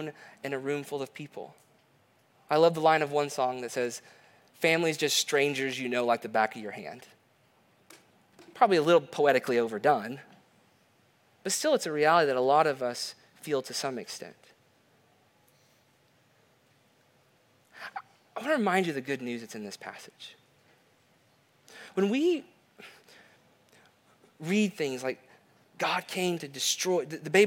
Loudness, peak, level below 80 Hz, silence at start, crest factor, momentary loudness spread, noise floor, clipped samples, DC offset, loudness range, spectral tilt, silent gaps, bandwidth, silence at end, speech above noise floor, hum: -28 LUFS; -8 dBFS; -84 dBFS; 0 s; 22 dB; 19 LU; -66 dBFS; under 0.1%; under 0.1%; 9 LU; -3.5 dB/octave; none; 17.5 kHz; 0 s; 38 dB; none